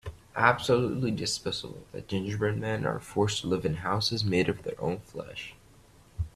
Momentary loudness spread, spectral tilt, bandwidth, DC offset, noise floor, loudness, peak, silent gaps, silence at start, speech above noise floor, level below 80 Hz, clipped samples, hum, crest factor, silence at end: 15 LU; -5 dB/octave; 14 kHz; under 0.1%; -57 dBFS; -29 LUFS; -4 dBFS; none; 0.05 s; 27 dB; -52 dBFS; under 0.1%; none; 24 dB; 0.05 s